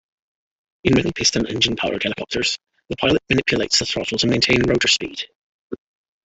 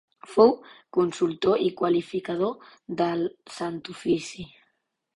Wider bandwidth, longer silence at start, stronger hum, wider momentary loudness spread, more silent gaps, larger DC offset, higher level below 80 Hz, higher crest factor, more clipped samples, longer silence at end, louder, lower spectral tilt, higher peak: second, 8.4 kHz vs 11 kHz; first, 0.85 s vs 0.3 s; neither; about the same, 16 LU vs 16 LU; first, 5.35-5.70 s vs none; neither; first, -44 dBFS vs -64 dBFS; about the same, 20 dB vs 22 dB; neither; second, 0.5 s vs 0.7 s; first, -19 LUFS vs -26 LUFS; second, -3.5 dB/octave vs -6 dB/octave; about the same, -2 dBFS vs -4 dBFS